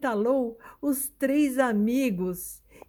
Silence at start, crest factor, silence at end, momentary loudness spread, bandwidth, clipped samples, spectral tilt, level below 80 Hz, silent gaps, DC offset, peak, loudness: 0 s; 16 dB; 0.3 s; 10 LU; 19.5 kHz; under 0.1%; -5.5 dB/octave; -60 dBFS; none; under 0.1%; -10 dBFS; -26 LUFS